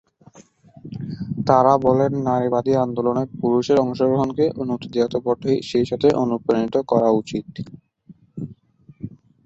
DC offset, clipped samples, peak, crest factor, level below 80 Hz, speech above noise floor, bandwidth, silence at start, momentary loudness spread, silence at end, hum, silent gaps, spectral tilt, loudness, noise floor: under 0.1%; under 0.1%; -2 dBFS; 18 dB; -54 dBFS; 31 dB; 8 kHz; 0.4 s; 19 LU; 0.4 s; none; none; -7.5 dB/octave; -20 LUFS; -50 dBFS